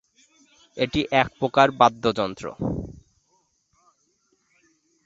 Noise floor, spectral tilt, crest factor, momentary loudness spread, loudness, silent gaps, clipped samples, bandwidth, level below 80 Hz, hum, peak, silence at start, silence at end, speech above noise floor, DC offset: -68 dBFS; -5.5 dB/octave; 24 dB; 14 LU; -22 LUFS; none; under 0.1%; 8 kHz; -50 dBFS; none; -2 dBFS; 0.75 s; 2.15 s; 47 dB; under 0.1%